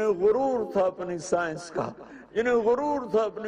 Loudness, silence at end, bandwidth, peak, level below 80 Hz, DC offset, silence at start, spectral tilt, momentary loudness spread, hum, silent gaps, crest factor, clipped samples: -27 LUFS; 0 s; 10.5 kHz; -12 dBFS; -60 dBFS; under 0.1%; 0 s; -5.5 dB/octave; 10 LU; none; none; 14 dB; under 0.1%